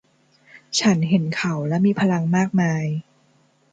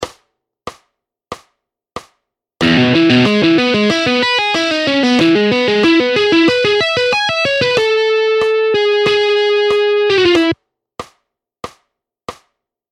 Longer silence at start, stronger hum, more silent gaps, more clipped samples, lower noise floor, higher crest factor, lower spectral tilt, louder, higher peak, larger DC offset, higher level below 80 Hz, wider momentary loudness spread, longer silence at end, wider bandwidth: first, 0.55 s vs 0 s; neither; neither; neither; second, -60 dBFS vs -69 dBFS; about the same, 16 dB vs 14 dB; about the same, -5.5 dB/octave vs -5 dB/octave; second, -21 LUFS vs -12 LUFS; second, -6 dBFS vs 0 dBFS; neither; second, -62 dBFS vs -50 dBFS; second, 6 LU vs 22 LU; about the same, 0.7 s vs 0.6 s; second, 9.2 kHz vs 11 kHz